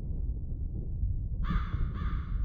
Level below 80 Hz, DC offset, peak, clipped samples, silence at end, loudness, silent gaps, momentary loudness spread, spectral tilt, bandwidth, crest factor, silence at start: -32 dBFS; under 0.1%; -18 dBFS; under 0.1%; 0 s; -36 LUFS; none; 5 LU; -9.5 dB/octave; 4.8 kHz; 14 dB; 0 s